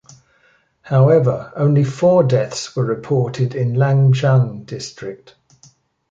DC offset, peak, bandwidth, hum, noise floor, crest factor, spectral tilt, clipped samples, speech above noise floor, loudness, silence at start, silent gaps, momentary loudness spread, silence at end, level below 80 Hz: under 0.1%; -2 dBFS; 7.8 kHz; none; -57 dBFS; 16 dB; -7.5 dB/octave; under 0.1%; 42 dB; -16 LUFS; 0.85 s; none; 15 LU; 0.95 s; -56 dBFS